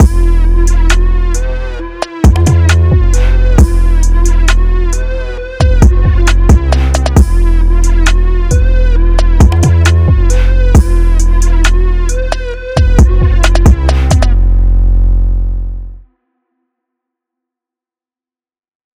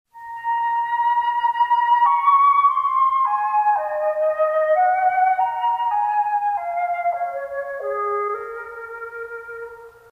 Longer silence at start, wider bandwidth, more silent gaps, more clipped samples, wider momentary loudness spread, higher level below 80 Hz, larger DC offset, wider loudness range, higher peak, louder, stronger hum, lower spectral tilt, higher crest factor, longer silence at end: second, 0 s vs 0.15 s; first, 11 kHz vs 5.2 kHz; neither; first, 2% vs under 0.1%; second, 9 LU vs 17 LU; first, -8 dBFS vs -66 dBFS; neither; second, 4 LU vs 8 LU; first, 0 dBFS vs -6 dBFS; first, -11 LUFS vs -19 LUFS; neither; first, -6 dB/octave vs -3 dB/octave; second, 8 dB vs 14 dB; first, 2.95 s vs 0.2 s